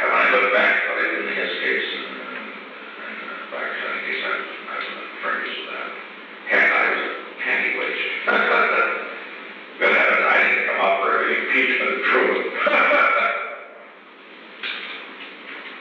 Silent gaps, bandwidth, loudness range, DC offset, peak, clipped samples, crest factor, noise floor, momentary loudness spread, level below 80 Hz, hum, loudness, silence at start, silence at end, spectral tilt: none; 7.2 kHz; 9 LU; under 0.1%; -6 dBFS; under 0.1%; 16 dB; -44 dBFS; 19 LU; -88 dBFS; none; -19 LUFS; 0 s; 0 s; -4.5 dB/octave